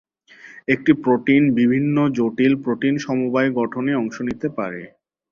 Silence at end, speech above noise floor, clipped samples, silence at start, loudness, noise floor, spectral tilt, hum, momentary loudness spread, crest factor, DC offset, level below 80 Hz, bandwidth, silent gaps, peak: 0.45 s; 27 dB; under 0.1%; 0.45 s; -19 LUFS; -46 dBFS; -7.5 dB/octave; none; 9 LU; 18 dB; under 0.1%; -58 dBFS; 7 kHz; none; -2 dBFS